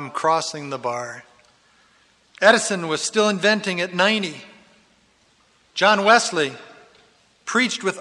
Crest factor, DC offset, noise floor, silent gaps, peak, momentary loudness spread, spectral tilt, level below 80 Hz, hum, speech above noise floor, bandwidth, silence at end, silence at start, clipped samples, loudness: 20 dB; under 0.1%; -59 dBFS; none; -2 dBFS; 16 LU; -3 dB/octave; -72 dBFS; none; 39 dB; 12 kHz; 0 s; 0 s; under 0.1%; -19 LUFS